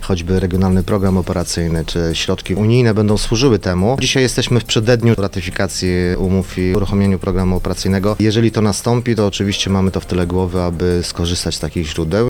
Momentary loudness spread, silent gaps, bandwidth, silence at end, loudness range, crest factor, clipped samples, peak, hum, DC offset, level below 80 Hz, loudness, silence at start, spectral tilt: 5 LU; none; 17.5 kHz; 0 s; 2 LU; 16 dB; under 0.1%; 0 dBFS; none; under 0.1%; -30 dBFS; -16 LUFS; 0 s; -5.5 dB/octave